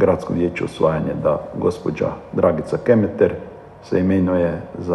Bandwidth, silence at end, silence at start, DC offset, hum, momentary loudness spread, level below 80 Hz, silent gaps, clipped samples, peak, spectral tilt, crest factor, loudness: 11.5 kHz; 0 s; 0 s; under 0.1%; none; 7 LU; -48 dBFS; none; under 0.1%; -2 dBFS; -8.5 dB/octave; 18 dB; -20 LUFS